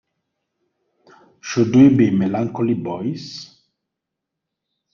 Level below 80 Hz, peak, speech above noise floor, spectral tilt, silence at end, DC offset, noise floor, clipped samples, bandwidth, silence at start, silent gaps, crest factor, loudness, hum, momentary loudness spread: -58 dBFS; -2 dBFS; 65 dB; -7 dB/octave; 1.5 s; under 0.1%; -82 dBFS; under 0.1%; 7 kHz; 1.45 s; none; 18 dB; -17 LUFS; none; 21 LU